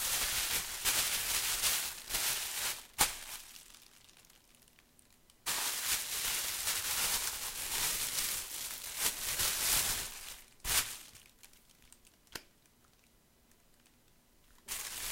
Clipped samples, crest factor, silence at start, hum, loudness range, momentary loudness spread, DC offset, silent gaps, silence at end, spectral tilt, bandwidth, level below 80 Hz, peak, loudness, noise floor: under 0.1%; 28 dB; 0 s; none; 8 LU; 16 LU; under 0.1%; none; 0 s; 1 dB/octave; 16.5 kHz; -58 dBFS; -10 dBFS; -33 LUFS; -67 dBFS